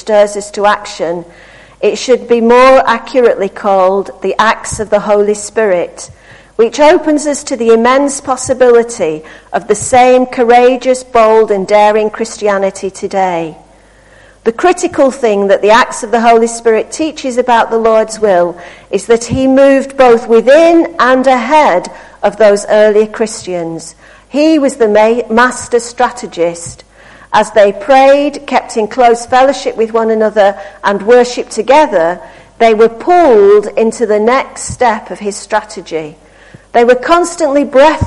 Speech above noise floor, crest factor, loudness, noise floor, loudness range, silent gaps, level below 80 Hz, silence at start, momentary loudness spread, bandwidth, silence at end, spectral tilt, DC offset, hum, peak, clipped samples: 32 dB; 10 dB; -10 LUFS; -42 dBFS; 4 LU; none; -42 dBFS; 0.05 s; 11 LU; 11.5 kHz; 0 s; -4 dB/octave; under 0.1%; none; 0 dBFS; 0.1%